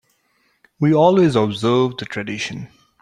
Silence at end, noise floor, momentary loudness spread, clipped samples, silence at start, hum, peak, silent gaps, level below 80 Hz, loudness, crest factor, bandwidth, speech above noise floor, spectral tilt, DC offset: 0.35 s; -64 dBFS; 14 LU; under 0.1%; 0.8 s; none; -2 dBFS; none; -58 dBFS; -18 LUFS; 16 dB; 11 kHz; 47 dB; -6.5 dB/octave; under 0.1%